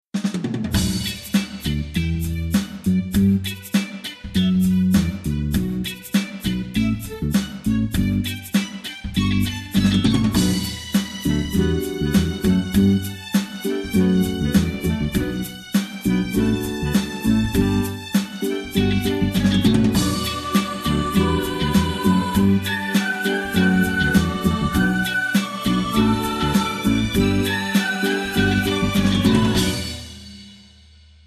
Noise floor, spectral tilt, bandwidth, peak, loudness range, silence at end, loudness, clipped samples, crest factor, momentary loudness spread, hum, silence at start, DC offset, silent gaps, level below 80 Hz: -48 dBFS; -5.5 dB/octave; 14 kHz; -4 dBFS; 3 LU; 0.7 s; -21 LUFS; under 0.1%; 16 dB; 7 LU; none; 0.15 s; under 0.1%; none; -34 dBFS